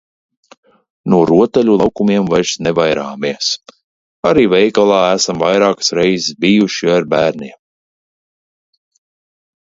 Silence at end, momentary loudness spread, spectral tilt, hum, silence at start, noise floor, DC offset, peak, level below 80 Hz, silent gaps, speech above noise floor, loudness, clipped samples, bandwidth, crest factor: 2.1 s; 7 LU; -4.5 dB/octave; none; 1.05 s; under -90 dBFS; under 0.1%; 0 dBFS; -48 dBFS; 3.84-4.23 s; over 77 dB; -13 LUFS; under 0.1%; 8 kHz; 14 dB